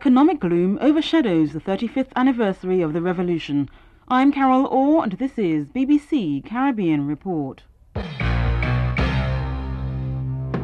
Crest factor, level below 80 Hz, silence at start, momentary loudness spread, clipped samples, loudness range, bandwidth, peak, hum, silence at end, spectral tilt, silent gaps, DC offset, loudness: 14 dB; -32 dBFS; 0 s; 9 LU; under 0.1%; 4 LU; 8.6 kHz; -8 dBFS; none; 0 s; -8.5 dB/octave; none; under 0.1%; -21 LUFS